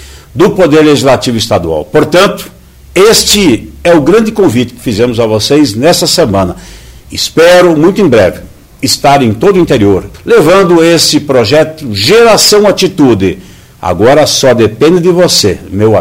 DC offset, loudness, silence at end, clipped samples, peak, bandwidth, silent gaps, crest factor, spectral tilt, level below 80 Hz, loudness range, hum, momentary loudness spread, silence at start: under 0.1%; -6 LUFS; 0 s; 3%; 0 dBFS; 16.5 kHz; none; 6 dB; -4.5 dB/octave; -34 dBFS; 2 LU; none; 9 LU; 0 s